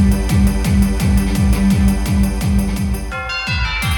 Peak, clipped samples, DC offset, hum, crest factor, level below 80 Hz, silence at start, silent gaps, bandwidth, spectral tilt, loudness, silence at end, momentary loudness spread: -2 dBFS; under 0.1%; under 0.1%; none; 12 dB; -18 dBFS; 0 s; none; 19 kHz; -6 dB/octave; -16 LUFS; 0 s; 6 LU